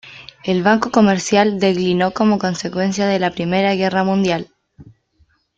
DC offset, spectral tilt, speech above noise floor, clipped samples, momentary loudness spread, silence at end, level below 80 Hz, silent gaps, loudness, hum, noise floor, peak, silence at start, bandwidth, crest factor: under 0.1%; -5.5 dB/octave; 43 dB; under 0.1%; 7 LU; 0.75 s; -54 dBFS; none; -17 LUFS; none; -59 dBFS; -2 dBFS; 0.05 s; 7.8 kHz; 16 dB